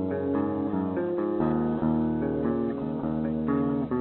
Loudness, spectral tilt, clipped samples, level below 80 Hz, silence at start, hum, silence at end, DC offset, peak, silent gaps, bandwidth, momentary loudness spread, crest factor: -28 LUFS; -12.5 dB/octave; under 0.1%; -50 dBFS; 0 s; none; 0 s; under 0.1%; -14 dBFS; none; 4.2 kHz; 3 LU; 14 dB